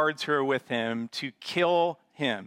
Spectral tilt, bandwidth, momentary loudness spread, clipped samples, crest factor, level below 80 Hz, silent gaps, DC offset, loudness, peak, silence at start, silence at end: -5 dB/octave; 15.5 kHz; 8 LU; under 0.1%; 16 dB; -76 dBFS; none; under 0.1%; -28 LUFS; -12 dBFS; 0 s; 0 s